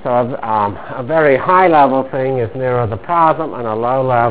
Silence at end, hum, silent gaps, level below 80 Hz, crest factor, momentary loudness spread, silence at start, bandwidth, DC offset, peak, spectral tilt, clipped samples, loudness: 0 s; none; none; -46 dBFS; 14 dB; 9 LU; 0.05 s; 4 kHz; 2%; 0 dBFS; -10.5 dB/octave; 0.1%; -14 LUFS